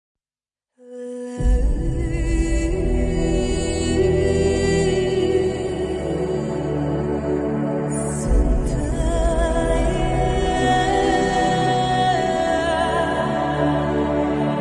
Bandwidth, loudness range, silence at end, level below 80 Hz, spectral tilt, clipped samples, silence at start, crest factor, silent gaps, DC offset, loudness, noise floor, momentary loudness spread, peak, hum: 11.5 kHz; 4 LU; 0 s; -26 dBFS; -6 dB/octave; under 0.1%; 0.85 s; 12 dB; none; under 0.1%; -21 LUFS; under -90 dBFS; 5 LU; -6 dBFS; none